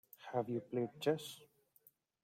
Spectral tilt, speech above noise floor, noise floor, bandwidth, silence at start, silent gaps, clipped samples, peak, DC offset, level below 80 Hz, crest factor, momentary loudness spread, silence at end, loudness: -6 dB/octave; 32 dB; -71 dBFS; 16.5 kHz; 0.2 s; none; under 0.1%; -22 dBFS; under 0.1%; -84 dBFS; 22 dB; 11 LU; 0.8 s; -41 LUFS